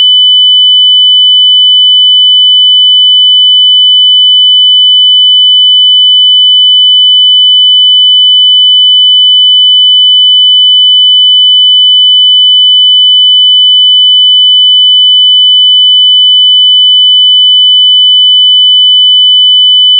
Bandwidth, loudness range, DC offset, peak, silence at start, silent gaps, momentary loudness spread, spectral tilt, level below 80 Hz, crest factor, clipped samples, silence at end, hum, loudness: 3.2 kHz; 0 LU; under 0.1%; 0 dBFS; 0 s; none; 0 LU; 18 dB/octave; under -90 dBFS; 4 dB; under 0.1%; 0 s; none; 0 LUFS